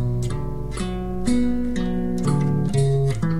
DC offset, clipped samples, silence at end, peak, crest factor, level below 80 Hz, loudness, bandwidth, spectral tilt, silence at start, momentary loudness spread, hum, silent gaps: 3%; under 0.1%; 0 s; -8 dBFS; 12 dB; -34 dBFS; -23 LUFS; 12 kHz; -7.5 dB/octave; 0 s; 8 LU; none; none